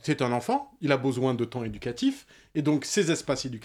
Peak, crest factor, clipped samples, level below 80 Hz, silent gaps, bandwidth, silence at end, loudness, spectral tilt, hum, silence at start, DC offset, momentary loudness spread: -8 dBFS; 18 dB; under 0.1%; -58 dBFS; none; 15.5 kHz; 0 s; -28 LUFS; -5 dB/octave; none; 0.05 s; under 0.1%; 8 LU